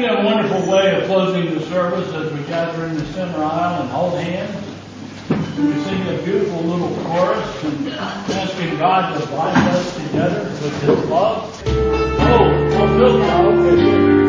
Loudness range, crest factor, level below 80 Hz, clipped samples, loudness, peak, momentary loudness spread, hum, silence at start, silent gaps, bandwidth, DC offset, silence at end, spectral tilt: 6 LU; 16 dB; -34 dBFS; under 0.1%; -17 LUFS; 0 dBFS; 11 LU; none; 0 s; none; 7.6 kHz; under 0.1%; 0 s; -6.5 dB/octave